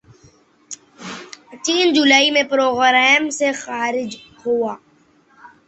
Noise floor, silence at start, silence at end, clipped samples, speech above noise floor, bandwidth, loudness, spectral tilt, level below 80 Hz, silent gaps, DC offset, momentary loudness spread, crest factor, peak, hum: -55 dBFS; 0.7 s; 0.2 s; under 0.1%; 38 dB; 8.4 kHz; -16 LUFS; -1.5 dB/octave; -64 dBFS; none; under 0.1%; 23 LU; 18 dB; -2 dBFS; none